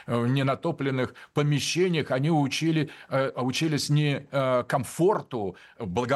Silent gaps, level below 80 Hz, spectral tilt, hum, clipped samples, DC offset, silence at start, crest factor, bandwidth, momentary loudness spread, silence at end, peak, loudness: none; -64 dBFS; -5.5 dB/octave; none; under 0.1%; under 0.1%; 0.05 s; 14 dB; 12.5 kHz; 6 LU; 0 s; -12 dBFS; -26 LUFS